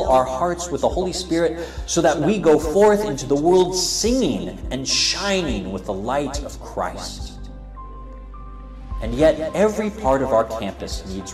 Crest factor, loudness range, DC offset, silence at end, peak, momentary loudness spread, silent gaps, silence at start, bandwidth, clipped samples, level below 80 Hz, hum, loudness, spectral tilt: 14 dB; 10 LU; 0.1%; 0 s; -6 dBFS; 22 LU; none; 0 s; 15.5 kHz; under 0.1%; -34 dBFS; none; -20 LUFS; -4 dB/octave